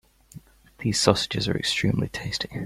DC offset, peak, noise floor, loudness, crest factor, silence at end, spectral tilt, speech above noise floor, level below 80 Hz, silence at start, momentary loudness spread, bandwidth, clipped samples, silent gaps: under 0.1%; -2 dBFS; -48 dBFS; -24 LUFS; 24 dB; 0 s; -4 dB/octave; 24 dB; -50 dBFS; 0.35 s; 9 LU; 16 kHz; under 0.1%; none